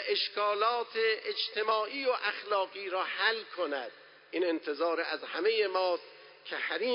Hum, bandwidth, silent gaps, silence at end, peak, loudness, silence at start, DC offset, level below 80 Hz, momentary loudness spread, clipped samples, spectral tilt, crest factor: none; 5.6 kHz; none; 0 s; -14 dBFS; -31 LUFS; 0 s; under 0.1%; under -90 dBFS; 8 LU; under 0.1%; -5 dB/octave; 18 dB